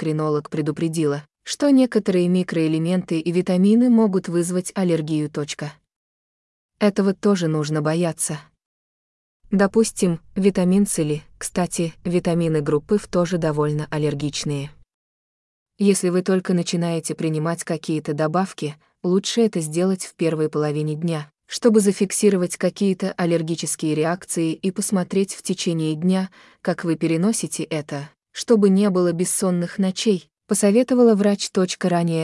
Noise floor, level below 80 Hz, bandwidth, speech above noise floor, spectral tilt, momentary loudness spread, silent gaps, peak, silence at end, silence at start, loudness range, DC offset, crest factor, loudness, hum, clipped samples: under -90 dBFS; -58 dBFS; 12 kHz; over 70 dB; -5.5 dB/octave; 9 LU; 5.96-6.69 s, 8.66-9.40 s, 14.94-15.66 s; -4 dBFS; 0 s; 0 s; 4 LU; under 0.1%; 16 dB; -21 LUFS; none; under 0.1%